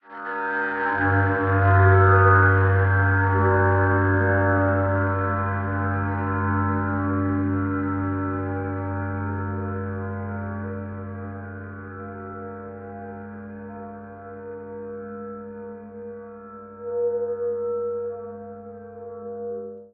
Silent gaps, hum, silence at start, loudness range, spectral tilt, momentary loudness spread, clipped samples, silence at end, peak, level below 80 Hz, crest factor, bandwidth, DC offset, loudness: none; none; 0.05 s; 19 LU; -8.5 dB/octave; 19 LU; under 0.1%; 0.05 s; -4 dBFS; -54 dBFS; 18 dB; 3.4 kHz; under 0.1%; -22 LUFS